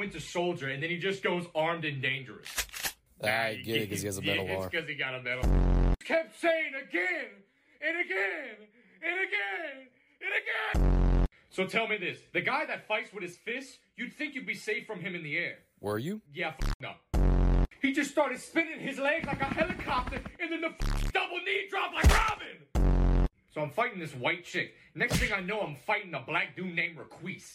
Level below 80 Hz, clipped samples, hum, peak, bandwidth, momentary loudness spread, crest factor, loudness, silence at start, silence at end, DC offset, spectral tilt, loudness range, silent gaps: -36 dBFS; under 0.1%; none; -12 dBFS; 16 kHz; 9 LU; 20 dB; -31 LUFS; 0 s; 0 s; under 0.1%; -5 dB/octave; 4 LU; 16.74-16.80 s